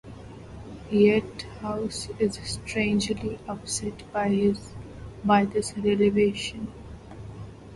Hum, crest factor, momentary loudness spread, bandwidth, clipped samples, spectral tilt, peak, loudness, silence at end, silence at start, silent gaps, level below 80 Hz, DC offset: none; 20 dB; 21 LU; 11.5 kHz; under 0.1%; -5 dB/octave; -6 dBFS; -26 LUFS; 0 s; 0.05 s; none; -48 dBFS; under 0.1%